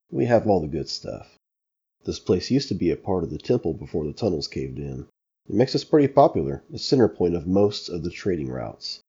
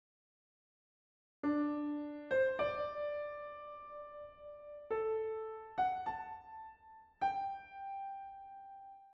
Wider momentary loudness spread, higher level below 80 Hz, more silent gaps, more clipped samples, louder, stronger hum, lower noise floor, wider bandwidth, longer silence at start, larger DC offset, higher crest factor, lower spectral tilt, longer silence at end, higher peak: second, 13 LU vs 17 LU; first, -48 dBFS vs -72 dBFS; neither; neither; first, -24 LUFS vs -40 LUFS; neither; first, -84 dBFS vs -60 dBFS; about the same, 7.8 kHz vs 7.4 kHz; second, 0.1 s vs 1.45 s; neither; about the same, 20 dB vs 16 dB; first, -6.5 dB/octave vs -3.5 dB/octave; about the same, 0.1 s vs 0 s; first, -2 dBFS vs -24 dBFS